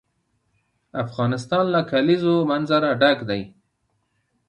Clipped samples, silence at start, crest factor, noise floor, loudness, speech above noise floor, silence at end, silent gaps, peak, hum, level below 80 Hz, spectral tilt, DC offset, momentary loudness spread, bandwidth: under 0.1%; 0.95 s; 18 dB; -71 dBFS; -21 LUFS; 51 dB; 1 s; none; -4 dBFS; none; -62 dBFS; -7 dB/octave; under 0.1%; 11 LU; 10 kHz